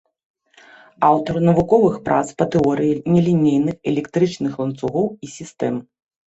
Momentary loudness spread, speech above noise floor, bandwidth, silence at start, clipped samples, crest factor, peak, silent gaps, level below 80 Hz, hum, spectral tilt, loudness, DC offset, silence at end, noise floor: 9 LU; 30 dB; 8.2 kHz; 1 s; under 0.1%; 18 dB; -2 dBFS; none; -50 dBFS; none; -7.5 dB/octave; -18 LUFS; under 0.1%; 0.6 s; -48 dBFS